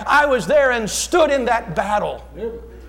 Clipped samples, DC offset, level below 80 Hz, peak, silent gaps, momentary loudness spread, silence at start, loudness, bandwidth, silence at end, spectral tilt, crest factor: under 0.1%; under 0.1%; -40 dBFS; -6 dBFS; none; 15 LU; 0 s; -17 LUFS; 17 kHz; 0 s; -3.5 dB/octave; 12 dB